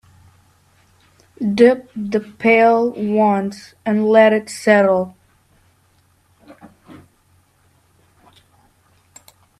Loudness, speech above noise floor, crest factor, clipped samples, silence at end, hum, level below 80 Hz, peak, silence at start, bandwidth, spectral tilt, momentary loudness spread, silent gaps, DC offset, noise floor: -16 LUFS; 43 dB; 18 dB; under 0.1%; 2.65 s; none; -62 dBFS; 0 dBFS; 1.4 s; 13 kHz; -6 dB/octave; 11 LU; none; under 0.1%; -58 dBFS